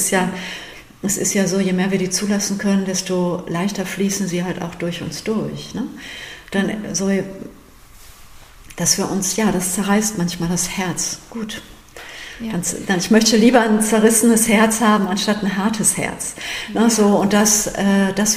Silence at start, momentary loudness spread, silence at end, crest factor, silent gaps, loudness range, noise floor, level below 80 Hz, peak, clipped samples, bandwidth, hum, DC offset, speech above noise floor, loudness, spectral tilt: 0 s; 15 LU; 0 s; 16 dB; none; 9 LU; -43 dBFS; -46 dBFS; -2 dBFS; under 0.1%; 15.5 kHz; none; under 0.1%; 25 dB; -18 LUFS; -4 dB/octave